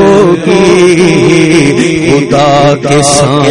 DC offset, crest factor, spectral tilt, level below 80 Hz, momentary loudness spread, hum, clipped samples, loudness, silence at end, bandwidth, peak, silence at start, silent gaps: under 0.1%; 6 dB; -5 dB/octave; -36 dBFS; 3 LU; none; 3%; -6 LUFS; 0 s; 12 kHz; 0 dBFS; 0 s; none